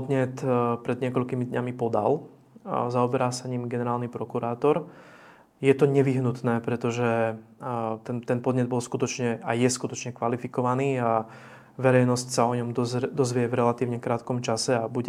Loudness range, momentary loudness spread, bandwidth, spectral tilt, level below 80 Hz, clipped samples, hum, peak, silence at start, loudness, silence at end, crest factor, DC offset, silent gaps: 3 LU; 8 LU; 14.5 kHz; -6 dB/octave; -70 dBFS; under 0.1%; none; -6 dBFS; 0 s; -26 LUFS; 0 s; 20 dB; under 0.1%; none